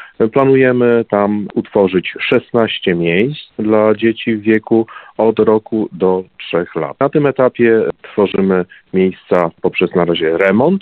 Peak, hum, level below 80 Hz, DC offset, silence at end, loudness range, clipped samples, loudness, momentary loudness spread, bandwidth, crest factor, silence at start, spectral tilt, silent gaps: 0 dBFS; none; -52 dBFS; under 0.1%; 0 s; 1 LU; under 0.1%; -14 LUFS; 8 LU; 4.5 kHz; 14 dB; 0 s; -9 dB/octave; none